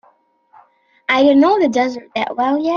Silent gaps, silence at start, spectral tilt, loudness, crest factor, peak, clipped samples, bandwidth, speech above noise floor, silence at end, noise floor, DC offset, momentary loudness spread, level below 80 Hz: none; 1.1 s; -4.5 dB/octave; -15 LUFS; 14 dB; -2 dBFS; under 0.1%; 7.2 kHz; 41 dB; 0 s; -56 dBFS; under 0.1%; 11 LU; -62 dBFS